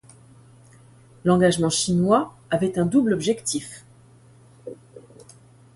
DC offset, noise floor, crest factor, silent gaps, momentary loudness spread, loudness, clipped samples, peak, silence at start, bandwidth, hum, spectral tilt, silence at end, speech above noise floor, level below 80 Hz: under 0.1%; -51 dBFS; 18 dB; none; 22 LU; -21 LUFS; under 0.1%; -6 dBFS; 1.25 s; 11.5 kHz; none; -5 dB/octave; 0.75 s; 31 dB; -56 dBFS